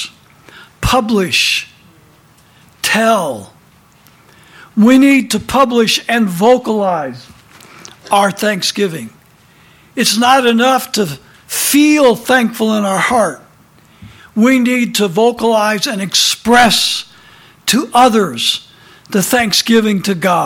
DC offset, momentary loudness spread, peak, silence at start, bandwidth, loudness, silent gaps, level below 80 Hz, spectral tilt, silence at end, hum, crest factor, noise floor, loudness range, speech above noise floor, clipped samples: under 0.1%; 11 LU; 0 dBFS; 0 s; 19 kHz; -12 LUFS; none; -42 dBFS; -3.5 dB/octave; 0 s; none; 14 dB; -47 dBFS; 4 LU; 35 dB; under 0.1%